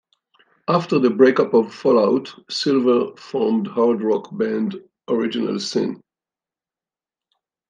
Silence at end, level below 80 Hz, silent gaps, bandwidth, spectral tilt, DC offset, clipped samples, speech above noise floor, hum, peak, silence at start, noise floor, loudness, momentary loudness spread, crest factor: 1.75 s; -72 dBFS; none; 9.4 kHz; -6 dB/octave; under 0.1%; under 0.1%; over 71 dB; none; -2 dBFS; 0.7 s; under -90 dBFS; -19 LUFS; 11 LU; 18 dB